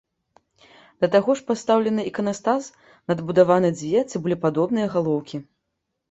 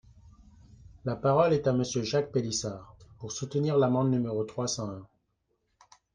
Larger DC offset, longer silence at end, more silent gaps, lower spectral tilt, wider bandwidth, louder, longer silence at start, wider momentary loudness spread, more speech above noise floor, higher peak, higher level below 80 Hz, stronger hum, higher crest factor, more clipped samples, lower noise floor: neither; second, 0.7 s vs 1.1 s; neither; about the same, -6.5 dB/octave vs -5.5 dB/octave; second, 8.2 kHz vs 10 kHz; first, -22 LUFS vs -29 LUFS; first, 1 s vs 0.7 s; second, 9 LU vs 14 LU; first, 57 dB vs 49 dB; first, -4 dBFS vs -10 dBFS; about the same, -64 dBFS vs -60 dBFS; neither; about the same, 18 dB vs 20 dB; neither; about the same, -78 dBFS vs -77 dBFS